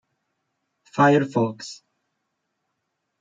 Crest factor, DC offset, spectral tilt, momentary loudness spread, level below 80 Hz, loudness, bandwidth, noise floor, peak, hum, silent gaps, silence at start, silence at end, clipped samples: 20 dB; under 0.1%; -6.5 dB/octave; 19 LU; -72 dBFS; -20 LUFS; 9 kHz; -78 dBFS; -4 dBFS; none; none; 0.95 s; 1.45 s; under 0.1%